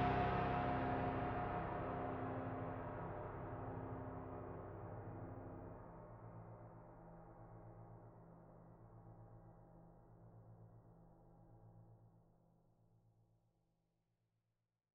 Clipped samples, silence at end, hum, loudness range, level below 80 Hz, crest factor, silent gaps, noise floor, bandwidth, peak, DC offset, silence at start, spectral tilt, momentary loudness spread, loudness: under 0.1%; 2.75 s; none; 22 LU; -62 dBFS; 22 dB; none; -90 dBFS; 6 kHz; -26 dBFS; under 0.1%; 0 s; -9 dB/octave; 24 LU; -46 LUFS